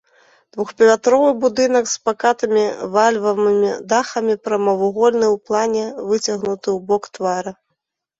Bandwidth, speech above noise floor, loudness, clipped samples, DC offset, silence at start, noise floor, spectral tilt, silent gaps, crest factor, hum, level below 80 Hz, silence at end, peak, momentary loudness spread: 8 kHz; 58 dB; -17 LUFS; under 0.1%; under 0.1%; 0.55 s; -75 dBFS; -4 dB/octave; none; 16 dB; none; -62 dBFS; 0.65 s; -2 dBFS; 8 LU